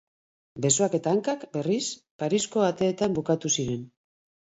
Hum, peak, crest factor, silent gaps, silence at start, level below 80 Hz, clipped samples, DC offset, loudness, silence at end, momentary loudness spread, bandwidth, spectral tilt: none; -6 dBFS; 20 dB; 2.11-2.19 s; 0.55 s; -62 dBFS; under 0.1%; under 0.1%; -26 LUFS; 0.6 s; 9 LU; 8.2 kHz; -4.5 dB/octave